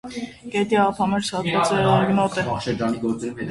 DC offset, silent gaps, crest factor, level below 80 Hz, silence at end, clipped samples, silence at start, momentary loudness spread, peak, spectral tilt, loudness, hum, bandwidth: under 0.1%; none; 16 dB; -50 dBFS; 0 s; under 0.1%; 0.05 s; 9 LU; -4 dBFS; -5.5 dB/octave; -21 LUFS; none; 11.5 kHz